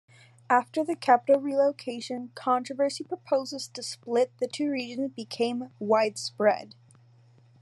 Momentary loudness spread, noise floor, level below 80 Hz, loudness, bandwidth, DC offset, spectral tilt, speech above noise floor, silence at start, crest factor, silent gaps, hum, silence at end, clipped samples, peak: 12 LU; -58 dBFS; -88 dBFS; -28 LUFS; 12 kHz; under 0.1%; -4 dB/octave; 31 dB; 0.5 s; 20 dB; none; none; 0.95 s; under 0.1%; -6 dBFS